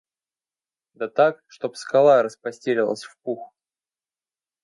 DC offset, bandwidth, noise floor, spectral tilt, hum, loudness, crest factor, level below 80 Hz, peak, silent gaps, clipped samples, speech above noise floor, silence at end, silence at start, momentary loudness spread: under 0.1%; 11.5 kHz; under -90 dBFS; -5.5 dB/octave; none; -22 LUFS; 20 dB; -80 dBFS; -4 dBFS; none; under 0.1%; over 69 dB; 1.15 s; 1 s; 16 LU